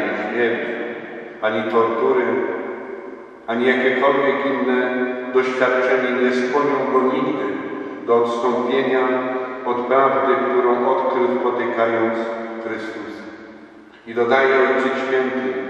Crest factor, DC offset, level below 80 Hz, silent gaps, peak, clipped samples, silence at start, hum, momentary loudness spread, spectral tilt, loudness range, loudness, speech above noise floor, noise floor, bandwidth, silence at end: 18 dB; under 0.1%; -68 dBFS; none; 0 dBFS; under 0.1%; 0 s; none; 12 LU; -5.5 dB/octave; 3 LU; -19 LUFS; 25 dB; -43 dBFS; 8 kHz; 0 s